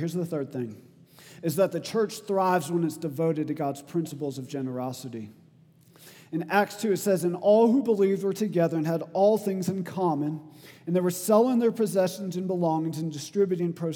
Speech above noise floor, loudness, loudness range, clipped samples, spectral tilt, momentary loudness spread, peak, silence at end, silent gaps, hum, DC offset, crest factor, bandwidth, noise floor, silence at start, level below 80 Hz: 31 dB; -26 LUFS; 7 LU; under 0.1%; -6.5 dB/octave; 12 LU; -8 dBFS; 0 s; none; none; under 0.1%; 20 dB; 19 kHz; -57 dBFS; 0 s; -80 dBFS